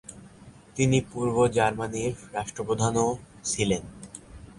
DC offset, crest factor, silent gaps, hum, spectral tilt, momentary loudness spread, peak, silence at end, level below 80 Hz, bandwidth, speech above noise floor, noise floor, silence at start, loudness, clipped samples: under 0.1%; 20 dB; none; none; -5 dB/octave; 19 LU; -8 dBFS; 0.05 s; -50 dBFS; 11.5 kHz; 24 dB; -50 dBFS; 0.1 s; -27 LUFS; under 0.1%